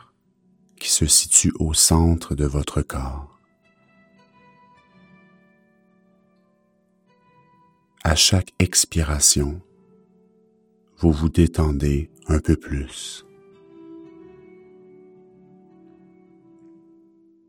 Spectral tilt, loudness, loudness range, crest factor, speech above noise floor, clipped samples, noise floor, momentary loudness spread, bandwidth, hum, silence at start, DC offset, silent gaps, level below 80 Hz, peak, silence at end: -3.5 dB/octave; -19 LUFS; 14 LU; 24 dB; 44 dB; under 0.1%; -63 dBFS; 18 LU; 17.5 kHz; none; 0.8 s; under 0.1%; none; -32 dBFS; 0 dBFS; 3.45 s